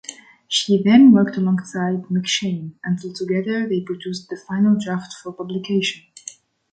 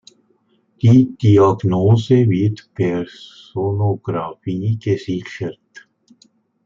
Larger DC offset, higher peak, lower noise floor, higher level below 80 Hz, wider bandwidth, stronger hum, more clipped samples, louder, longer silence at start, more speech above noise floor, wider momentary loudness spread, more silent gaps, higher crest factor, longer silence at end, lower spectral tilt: neither; about the same, -2 dBFS vs -2 dBFS; second, -41 dBFS vs -61 dBFS; second, -64 dBFS vs -56 dBFS; first, 9.2 kHz vs 7.4 kHz; neither; neither; about the same, -19 LUFS vs -17 LUFS; second, 0.1 s vs 0.85 s; second, 23 dB vs 44 dB; first, 19 LU vs 15 LU; neither; about the same, 16 dB vs 16 dB; about the same, 0.75 s vs 0.85 s; second, -5.5 dB/octave vs -9 dB/octave